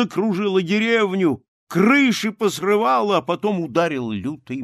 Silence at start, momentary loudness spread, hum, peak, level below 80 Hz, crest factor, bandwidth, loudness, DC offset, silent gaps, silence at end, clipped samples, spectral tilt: 0 s; 10 LU; none; -4 dBFS; -64 dBFS; 16 dB; 14.5 kHz; -19 LUFS; under 0.1%; 1.48-1.67 s; 0 s; under 0.1%; -5.5 dB/octave